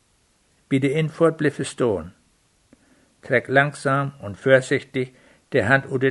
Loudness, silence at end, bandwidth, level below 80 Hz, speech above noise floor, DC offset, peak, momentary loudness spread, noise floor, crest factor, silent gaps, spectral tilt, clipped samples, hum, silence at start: -21 LUFS; 0 s; 11.5 kHz; -58 dBFS; 42 dB; under 0.1%; -2 dBFS; 11 LU; -63 dBFS; 20 dB; none; -6 dB/octave; under 0.1%; none; 0.7 s